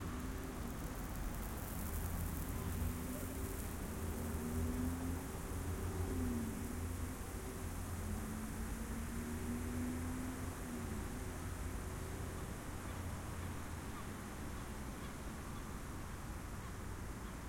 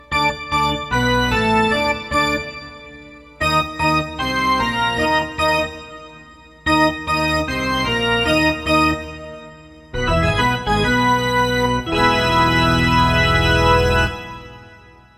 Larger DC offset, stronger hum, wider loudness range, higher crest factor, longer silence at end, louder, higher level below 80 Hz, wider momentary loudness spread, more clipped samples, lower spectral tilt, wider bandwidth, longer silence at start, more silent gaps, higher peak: neither; neither; about the same, 5 LU vs 4 LU; about the same, 16 dB vs 16 dB; second, 0 s vs 0.45 s; second, -44 LUFS vs -17 LUFS; second, -48 dBFS vs -32 dBFS; second, 6 LU vs 16 LU; neither; about the same, -5.5 dB/octave vs -5 dB/octave; about the same, 17 kHz vs 16 kHz; about the same, 0 s vs 0.1 s; neither; second, -28 dBFS vs -2 dBFS